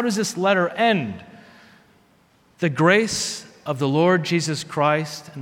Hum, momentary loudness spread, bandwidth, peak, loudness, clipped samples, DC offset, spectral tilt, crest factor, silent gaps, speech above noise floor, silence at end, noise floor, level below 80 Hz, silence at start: none; 13 LU; 16.5 kHz; -2 dBFS; -21 LUFS; under 0.1%; under 0.1%; -4.5 dB/octave; 20 dB; none; 37 dB; 0 s; -58 dBFS; -62 dBFS; 0 s